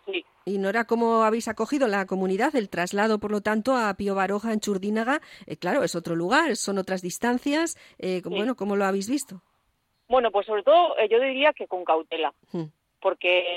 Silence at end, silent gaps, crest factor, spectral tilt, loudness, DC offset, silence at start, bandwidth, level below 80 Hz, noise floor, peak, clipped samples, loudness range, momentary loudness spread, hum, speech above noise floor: 0 s; none; 16 dB; -4.5 dB/octave; -25 LUFS; under 0.1%; 0.05 s; 16.5 kHz; -64 dBFS; -72 dBFS; -8 dBFS; under 0.1%; 3 LU; 9 LU; none; 47 dB